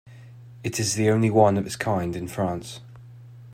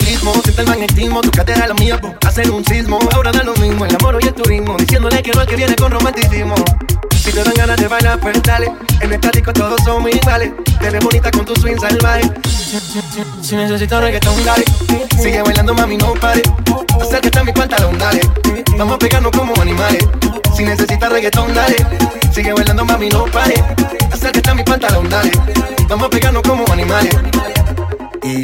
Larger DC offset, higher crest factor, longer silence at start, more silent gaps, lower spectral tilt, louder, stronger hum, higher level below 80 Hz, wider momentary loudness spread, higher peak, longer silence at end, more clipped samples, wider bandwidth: neither; first, 20 dB vs 12 dB; about the same, 0.05 s vs 0 s; neither; about the same, -5.5 dB/octave vs -5 dB/octave; second, -24 LUFS vs -12 LUFS; neither; second, -58 dBFS vs -18 dBFS; first, 15 LU vs 3 LU; second, -4 dBFS vs 0 dBFS; about the same, 0 s vs 0 s; neither; about the same, 16 kHz vs 17 kHz